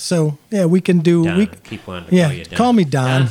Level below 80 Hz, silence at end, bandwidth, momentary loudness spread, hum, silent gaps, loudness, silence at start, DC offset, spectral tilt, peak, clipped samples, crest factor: -50 dBFS; 0 s; 13.5 kHz; 8 LU; none; none; -16 LUFS; 0 s; under 0.1%; -6.5 dB/octave; -2 dBFS; under 0.1%; 14 dB